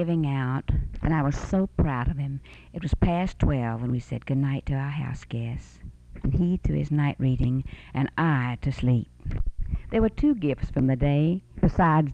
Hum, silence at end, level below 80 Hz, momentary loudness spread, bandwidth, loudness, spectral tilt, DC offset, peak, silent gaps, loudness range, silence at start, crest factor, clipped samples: none; 0 s; -34 dBFS; 11 LU; 8.2 kHz; -26 LUFS; -8.5 dB/octave; under 0.1%; -10 dBFS; none; 3 LU; 0 s; 16 dB; under 0.1%